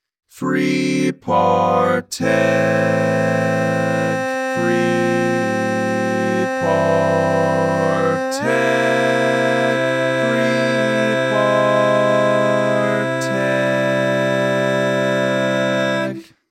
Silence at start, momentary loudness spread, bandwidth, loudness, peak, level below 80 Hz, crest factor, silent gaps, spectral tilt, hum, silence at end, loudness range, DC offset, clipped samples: 0.35 s; 4 LU; 15 kHz; -17 LUFS; -2 dBFS; -64 dBFS; 14 dB; none; -5.5 dB/octave; none; 0.3 s; 2 LU; under 0.1%; under 0.1%